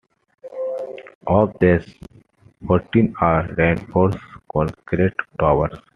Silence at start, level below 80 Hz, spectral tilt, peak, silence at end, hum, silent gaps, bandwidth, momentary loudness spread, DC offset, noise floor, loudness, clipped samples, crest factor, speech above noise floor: 0.45 s; -42 dBFS; -9.5 dB/octave; -2 dBFS; 0.2 s; none; 1.15-1.21 s; 6.4 kHz; 13 LU; under 0.1%; -51 dBFS; -20 LUFS; under 0.1%; 18 dB; 33 dB